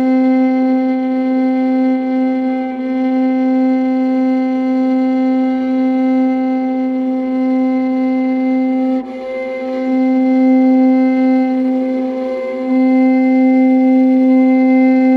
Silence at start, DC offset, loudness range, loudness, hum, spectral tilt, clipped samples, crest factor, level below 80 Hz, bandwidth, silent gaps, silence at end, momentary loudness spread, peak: 0 s; under 0.1%; 3 LU; -14 LUFS; none; -7.5 dB/octave; under 0.1%; 8 dB; -60 dBFS; 4.7 kHz; none; 0 s; 7 LU; -4 dBFS